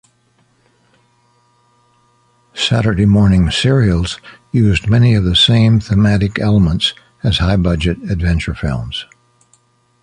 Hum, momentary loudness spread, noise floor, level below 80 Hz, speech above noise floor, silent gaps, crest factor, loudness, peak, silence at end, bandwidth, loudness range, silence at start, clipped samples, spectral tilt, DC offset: none; 11 LU; -57 dBFS; -28 dBFS; 44 dB; none; 14 dB; -14 LUFS; 0 dBFS; 1 s; 10.5 kHz; 6 LU; 2.55 s; under 0.1%; -6 dB/octave; under 0.1%